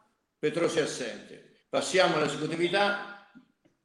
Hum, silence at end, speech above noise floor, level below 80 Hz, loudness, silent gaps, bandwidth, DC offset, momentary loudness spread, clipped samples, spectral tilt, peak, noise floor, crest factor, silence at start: none; 0.45 s; 31 dB; -74 dBFS; -28 LUFS; none; 12.5 kHz; under 0.1%; 12 LU; under 0.1%; -3.5 dB/octave; -8 dBFS; -59 dBFS; 22 dB; 0.45 s